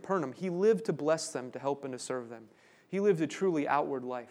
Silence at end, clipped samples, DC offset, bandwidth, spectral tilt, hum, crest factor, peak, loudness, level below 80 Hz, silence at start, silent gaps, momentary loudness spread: 0 s; under 0.1%; under 0.1%; 12.5 kHz; -5.5 dB/octave; none; 18 dB; -14 dBFS; -32 LUFS; -84 dBFS; 0 s; none; 10 LU